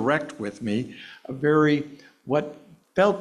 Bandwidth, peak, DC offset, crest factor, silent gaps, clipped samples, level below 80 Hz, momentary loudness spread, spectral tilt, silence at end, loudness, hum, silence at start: 11 kHz; -8 dBFS; under 0.1%; 16 dB; none; under 0.1%; -64 dBFS; 19 LU; -7 dB/octave; 0 s; -25 LUFS; none; 0 s